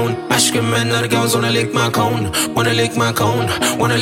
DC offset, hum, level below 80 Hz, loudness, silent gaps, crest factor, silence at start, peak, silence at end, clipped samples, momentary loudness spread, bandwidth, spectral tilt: under 0.1%; none; -46 dBFS; -16 LUFS; none; 14 dB; 0 s; -2 dBFS; 0 s; under 0.1%; 3 LU; 17 kHz; -4 dB/octave